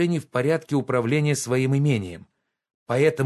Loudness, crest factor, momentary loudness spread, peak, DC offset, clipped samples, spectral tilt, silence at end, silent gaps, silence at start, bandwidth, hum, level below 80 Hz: -23 LUFS; 16 dB; 6 LU; -6 dBFS; under 0.1%; under 0.1%; -6 dB/octave; 0 s; 2.74-2.86 s; 0 s; 12.5 kHz; none; -56 dBFS